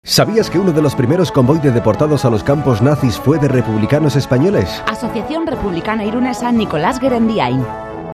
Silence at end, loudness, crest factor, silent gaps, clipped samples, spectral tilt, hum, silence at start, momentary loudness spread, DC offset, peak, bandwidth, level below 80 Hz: 0 s; -14 LUFS; 14 dB; none; under 0.1%; -6.5 dB/octave; none; 0.05 s; 7 LU; under 0.1%; 0 dBFS; 14 kHz; -38 dBFS